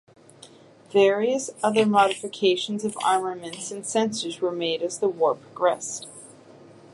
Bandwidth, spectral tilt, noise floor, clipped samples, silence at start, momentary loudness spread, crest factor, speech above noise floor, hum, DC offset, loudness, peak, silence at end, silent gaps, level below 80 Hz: 11.5 kHz; -3.5 dB/octave; -50 dBFS; under 0.1%; 0.4 s; 13 LU; 18 dB; 26 dB; none; under 0.1%; -24 LUFS; -6 dBFS; 0.6 s; none; -76 dBFS